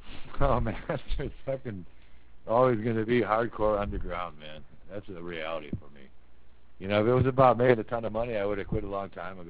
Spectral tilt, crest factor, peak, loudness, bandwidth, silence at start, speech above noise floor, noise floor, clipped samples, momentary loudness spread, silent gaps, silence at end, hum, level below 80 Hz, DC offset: -11 dB/octave; 22 dB; -8 dBFS; -28 LUFS; 4 kHz; 0 s; 26 dB; -54 dBFS; under 0.1%; 18 LU; none; 0 s; none; -42 dBFS; 0.7%